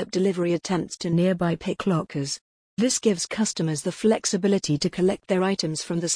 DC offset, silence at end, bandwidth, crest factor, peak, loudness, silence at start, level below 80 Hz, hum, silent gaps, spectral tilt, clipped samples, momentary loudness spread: under 0.1%; 0 s; 10.5 kHz; 16 dB; -8 dBFS; -24 LUFS; 0 s; -58 dBFS; none; 2.41-2.77 s; -5 dB/octave; under 0.1%; 5 LU